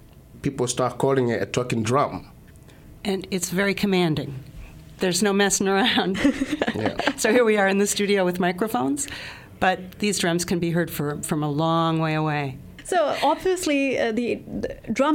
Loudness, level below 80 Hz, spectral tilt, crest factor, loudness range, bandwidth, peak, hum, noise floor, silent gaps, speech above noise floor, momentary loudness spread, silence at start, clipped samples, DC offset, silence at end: -23 LUFS; -50 dBFS; -4.5 dB/octave; 20 dB; 4 LU; 17 kHz; -4 dBFS; none; -47 dBFS; none; 24 dB; 10 LU; 0.15 s; under 0.1%; under 0.1%; 0 s